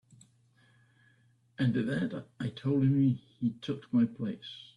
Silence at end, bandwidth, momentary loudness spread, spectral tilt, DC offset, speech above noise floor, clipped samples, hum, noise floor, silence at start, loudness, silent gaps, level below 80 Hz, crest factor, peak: 0.1 s; 9.8 kHz; 12 LU; -8.5 dB/octave; under 0.1%; 36 dB; under 0.1%; none; -67 dBFS; 1.6 s; -31 LUFS; none; -68 dBFS; 14 dB; -18 dBFS